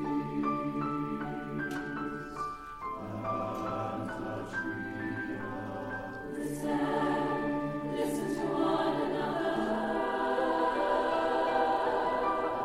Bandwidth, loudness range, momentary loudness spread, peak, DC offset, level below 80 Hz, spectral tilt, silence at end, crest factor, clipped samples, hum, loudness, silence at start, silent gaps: 15.5 kHz; 7 LU; 9 LU; -16 dBFS; under 0.1%; -56 dBFS; -6 dB/octave; 0 s; 16 dB; under 0.1%; none; -33 LUFS; 0 s; none